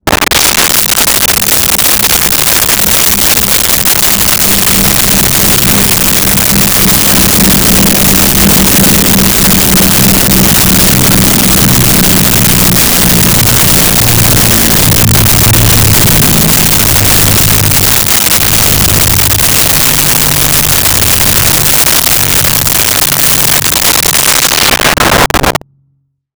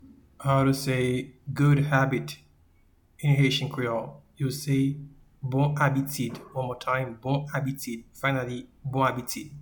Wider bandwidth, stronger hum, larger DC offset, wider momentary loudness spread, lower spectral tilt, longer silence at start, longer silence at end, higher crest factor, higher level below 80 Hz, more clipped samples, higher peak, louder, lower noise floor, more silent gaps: about the same, over 20 kHz vs 19 kHz; neither; neither; second, 1 LU vs 13 LU; second, -2.5 dB/octave vs -6 dB/octave; about the same, 0.05 s vs 0.05 s; first, 0.85 s vs 0 s; second, 6 dB vs 18 dB; first, -22 dBFS vs -56 dBFS; neither; first, 0 dBFS vs -8 dBFS; first, -4 LUFS vs -27 LUFS; second, -56 dBFS vs -61 dBFS; neither